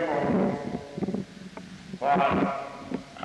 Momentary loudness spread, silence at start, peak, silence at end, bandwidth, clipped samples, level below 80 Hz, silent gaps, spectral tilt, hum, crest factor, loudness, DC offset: 18 LU; 0 s; -12 dBFS; 0 s; 11 kHz; under 0.1%; -56 dBFS; none; -7 dB/octave; none; 16 dB; -28 LUFS; under 0.1%